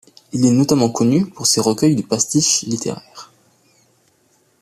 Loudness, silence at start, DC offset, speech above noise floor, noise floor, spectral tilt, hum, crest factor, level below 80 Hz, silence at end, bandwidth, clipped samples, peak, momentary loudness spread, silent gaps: -16 LUFS; 0.35 s; under 0.1%; 43 dB; -59 dBFS; -4.5 dB/octave; none; 16 dB; -56 dBFS; 1.35 s; 14.5 kHz; under 0.1%; -2 dBFS; 10 LU; none